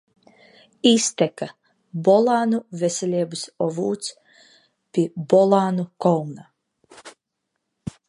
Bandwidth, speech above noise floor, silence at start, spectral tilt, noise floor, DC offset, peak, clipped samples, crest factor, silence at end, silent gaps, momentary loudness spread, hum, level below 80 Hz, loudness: 11.5 kHz; 58 dB; 0.85 s; -5 dB/octave; -79 dBFS; under 0.1%; -2 dBFS; under 0.1%; 22 dB; 0.2 s; none; 17 LU; none; -66 dBFS; -21 LUFS